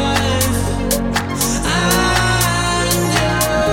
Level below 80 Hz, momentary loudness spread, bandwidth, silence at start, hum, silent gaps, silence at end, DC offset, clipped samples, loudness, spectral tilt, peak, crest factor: -28 dBFS; 4 LU; 18.5 kHz; 0 s; none; none; 0 s; under 0.1%; under 0.1%; -16 LUFS; -3.5 dB/octave; -2 dBFS; 14 dB